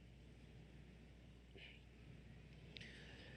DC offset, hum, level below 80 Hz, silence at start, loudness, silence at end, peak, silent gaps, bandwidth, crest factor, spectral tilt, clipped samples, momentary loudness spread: under 0.1%; none; -66 dBFS; 0 s; -61 LUFS; 0 s; -34 dBFS; none; 10.5 kHz; 26 dB; -5 dB/octave; under 0.1%; 7 LU